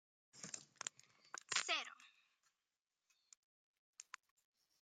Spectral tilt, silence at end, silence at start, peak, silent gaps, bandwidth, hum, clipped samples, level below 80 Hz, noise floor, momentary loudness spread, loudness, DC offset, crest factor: 1 dB/octave; 0.8 s; 0.35 s; -24 dBFS; 3.37-3.93 s; 15 kHz; none; under 0.1%; under -90 dBFS; under -90 dBFS; 25 LU; -45 LUFS; under 0.1%; 28 dB